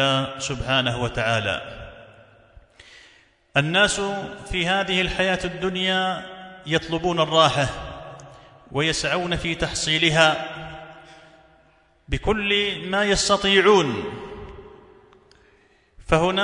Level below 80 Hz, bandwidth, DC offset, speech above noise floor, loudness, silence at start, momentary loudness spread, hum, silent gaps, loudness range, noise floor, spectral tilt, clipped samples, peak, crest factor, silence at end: -42 dBFS; 11 kHz; under 0.1%; 37 dB; -21 LUFS; 0 s; 20 LU; none; none; 4 LU; -58 dBFS; -3.5 dB/octave; under 0.1%; -2 dBFS; 22 dB; 0 s